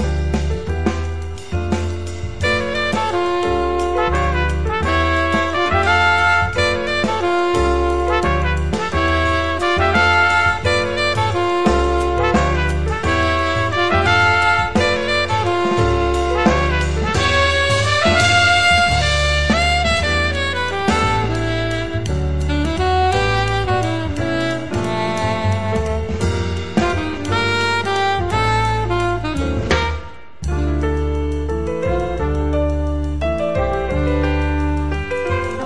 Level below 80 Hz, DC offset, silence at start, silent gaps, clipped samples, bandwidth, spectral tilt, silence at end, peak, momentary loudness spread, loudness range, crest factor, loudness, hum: -26 dBFS; 2%; 0 s; none; under 0.1%; 11 kHz; -5 dB/octave; 0 s; 0 dBFS; 8 LU; 6 LU; 16 dB; -17 LUFS; none